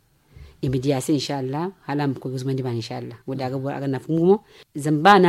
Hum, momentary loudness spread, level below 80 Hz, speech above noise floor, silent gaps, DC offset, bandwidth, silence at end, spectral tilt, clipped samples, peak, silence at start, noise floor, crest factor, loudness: none; 11 LU; -54 dBFS; 26 dB; none; under 0.1%; 15 kHz; 0 s; -6 dB/octave; under 0.1%; -2 dBFS; 0.35 s; -47 dBFS; 20 dB; -24 LUFS